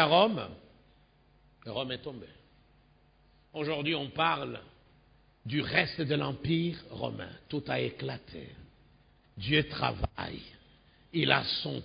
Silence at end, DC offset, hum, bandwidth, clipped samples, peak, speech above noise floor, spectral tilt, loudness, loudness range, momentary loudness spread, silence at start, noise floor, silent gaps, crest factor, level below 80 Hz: 0 s; under 0.1%; none; 5.2 kHz; under 0.1%; -8 dBFS; 32 dB; -9 dB/octave; -31 LUFS; 6 LU; 19 LU; 0 s; -64 dBFS; none; 26 dB; -54 dBFS